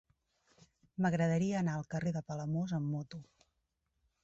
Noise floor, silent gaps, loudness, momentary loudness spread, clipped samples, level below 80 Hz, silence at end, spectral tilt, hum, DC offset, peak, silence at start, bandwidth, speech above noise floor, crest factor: -83 dBFS; none; -35 LUFS; 13 LU; under 0.1%; -68 dBFS; 1 s; -7.5 dB/octave; none; under 0.1%; -20 dBFS; 1 s; 8 kHz; 48 dB; 16 dB